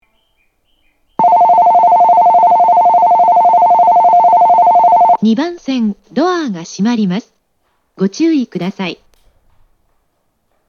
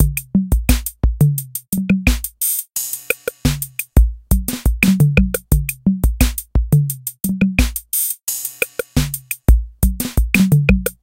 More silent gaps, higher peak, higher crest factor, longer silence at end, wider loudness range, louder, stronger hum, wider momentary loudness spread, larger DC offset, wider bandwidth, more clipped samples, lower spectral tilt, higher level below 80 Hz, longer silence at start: neither; about the same, 0 dBFS vs 0 dBFS; second, 10 dB vs 16 dB; first, 1.75 s vs 0.1 s; first, 11 LU vs 2 LU; first, -10 LUFS vs -18 LUFS; neither; first, 11 LU vs 8 LU; neither; second, 7 kHz vs 17.5 kHz; neither; first, -6.5 dB/octave vs -5 dB/octave; second, -58 dBFS vs -20 dBFS; first, 1.2 s vs 0 s